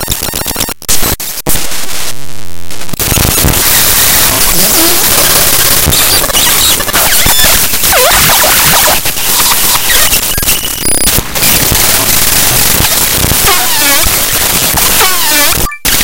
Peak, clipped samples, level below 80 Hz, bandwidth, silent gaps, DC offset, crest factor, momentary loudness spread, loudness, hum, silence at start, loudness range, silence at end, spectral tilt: 0 dBFS; 2%; -22 dBFS; over 20 kHz; none; under 0.1%; 8 dB; 8 LU; -6 LUFS; none; 0 s; 4 LU; 0 s; -1 dB/octave